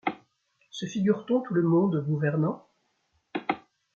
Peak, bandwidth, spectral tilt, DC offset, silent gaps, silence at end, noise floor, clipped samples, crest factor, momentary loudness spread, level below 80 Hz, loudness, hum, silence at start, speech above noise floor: -10 dBFS; 7.2 kHz; -7.5 dB/octave; under 0.1%; none; 0.35 s; -73 dBFS; under 0.1%; 18 dB; 15 LU; -72 dBFS; -28 LUFS; none; 0.05 s; 47 dB